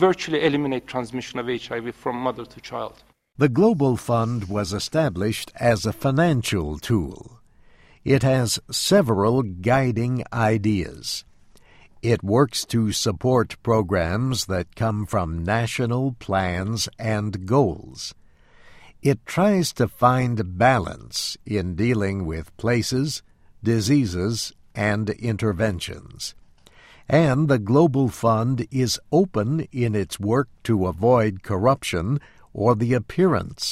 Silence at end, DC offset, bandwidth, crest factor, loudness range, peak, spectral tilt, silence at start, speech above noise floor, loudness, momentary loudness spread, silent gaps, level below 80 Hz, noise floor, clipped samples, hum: 0 s; under 0.1%; 15.5 kHz; 18 dB; 3 LU; -4 dBFS; -5.5 dB/octave; 0 s; 30 dB; -22 LUFS; 10 LU; none; -46 dBFS; -52 dBFS; under 0.1%; none